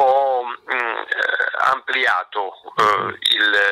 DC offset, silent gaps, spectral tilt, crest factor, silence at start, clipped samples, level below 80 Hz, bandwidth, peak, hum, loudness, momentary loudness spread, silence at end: under 0.1%; none; -2 dB/octave; 14 dB; 0 s; under 0.1%; -64 dBFS; 16 kHz; -6 dBFS; none; -19 LUFS; 8 LU; 0 s